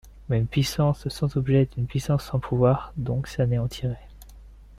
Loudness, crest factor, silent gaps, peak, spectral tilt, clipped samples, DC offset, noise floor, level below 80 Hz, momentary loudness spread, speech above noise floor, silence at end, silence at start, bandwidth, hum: -25 LUFS; 16 dB; none; -8 dBFS; -7 dB/octave; under 0.1%; under 0.1%; -46 dBFS; -44 dBFS; 7 LU; 22 dB; 0 s; 0.05 s; 15 kHz; none